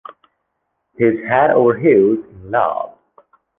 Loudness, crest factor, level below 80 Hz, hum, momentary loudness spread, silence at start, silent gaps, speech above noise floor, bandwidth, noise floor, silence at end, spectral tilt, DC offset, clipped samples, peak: -15 LUFS; 16 dB; -54 dBFS; none; 11 LU; 1 s; none; 58 dB; 3.7 kHz; -72 dBFS; 0.7 s; -10.5 dB/octave; under 0.1%; under 0.1%; -2 dBFS